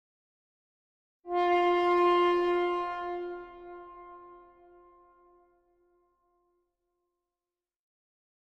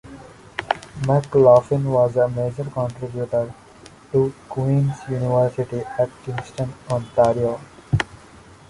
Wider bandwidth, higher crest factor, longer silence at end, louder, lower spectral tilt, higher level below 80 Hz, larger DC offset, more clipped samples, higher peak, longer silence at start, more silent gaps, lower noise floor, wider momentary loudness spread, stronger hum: second, 6.4 kHz vs 11.5 kHz; about the same, 18 dB vs 18 dB; first, 4.1 s vs 0.55 s; second, -27 LUFS vs -21 LUFS; second, -5 dB/octave vs -7.5 dB/octave; second, -68 dBFS vs -48 dBFS; neither; neither; second, -14 dBFS vs -2 dBFS; first, 1.25 s vs 0.05 s; neither; first, under -90 dBFS vs -45 dBFS; first, 23 LU vs 13 LU; neither